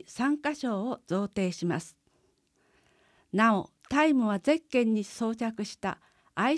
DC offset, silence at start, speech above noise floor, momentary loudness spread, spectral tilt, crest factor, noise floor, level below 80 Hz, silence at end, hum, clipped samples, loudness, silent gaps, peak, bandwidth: under 0.1%; 0.1 s; 42 dB; 11 LU; -5.5 dB/octave; 18 dB; -70 dBFS; -66 dBFS; 0 s; none; under 0.1%; -29 LUFS; none; -12 dBFS; 11 kHz